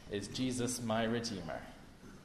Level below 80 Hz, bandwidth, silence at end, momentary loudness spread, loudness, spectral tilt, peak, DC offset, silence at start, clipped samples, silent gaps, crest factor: -60 dBFS; 13.5 kHz; 0 s; 19 LU; -37 LUFS; -4.5 dB/octave; -22 dBFS; under 0.1%; 0 s; under 0.1%; none; 16 dB